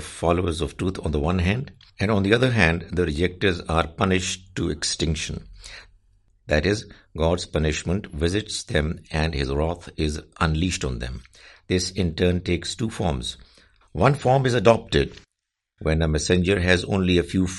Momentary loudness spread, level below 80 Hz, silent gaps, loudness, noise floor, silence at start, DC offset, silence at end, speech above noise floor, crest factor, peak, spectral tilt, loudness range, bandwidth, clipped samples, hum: 10 LU; -38 dBFS; none; -23 LUFS; -82 dBFS; 0 s; under 0.1%; 0 s; 59 dB; 22 dB; 0 dBFS; -5 dB/octave; 5 LU; 11.5 kHz; under 0.1%; none